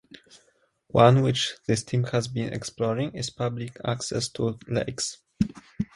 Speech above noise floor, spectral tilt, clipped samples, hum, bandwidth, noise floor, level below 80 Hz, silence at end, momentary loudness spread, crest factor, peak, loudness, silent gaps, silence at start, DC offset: 41 dB; -5.5 dB/octave; under 0.1%; none; 11.5 kHz; -66 dBFS; -54 dBFS; 0.1 s; 12 LU; 22 dB; -4 dBFS; -26 LUFS; none; 0.95 s; under 0.1%